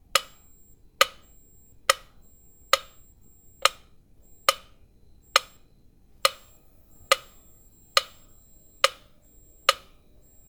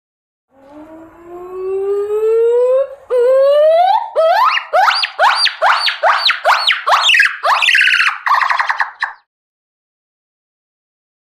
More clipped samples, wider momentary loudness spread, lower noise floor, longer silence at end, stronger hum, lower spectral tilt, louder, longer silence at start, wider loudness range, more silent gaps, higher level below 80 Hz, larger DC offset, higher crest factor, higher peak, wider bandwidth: neither; second, 4 LU vs 9 LU; first, -57 dBFS vs -37 dBFS; second, 0.75 s vs 2.1 s; neither; about the same, 1 dB/octave vs 0.5 dB/octave; second, -25 LUFS vs -12 LUFS; second, 0.15 s vs 0.75 s; second, 2 LU vs 6 LU; neither; first, -58 dBFS vs -64 dBFS; neither; first, 30 dB vs 14 dB; about the same, 0 dBFS vs 0 dBFS; first, 19.5 kHz vs 15.5 kHz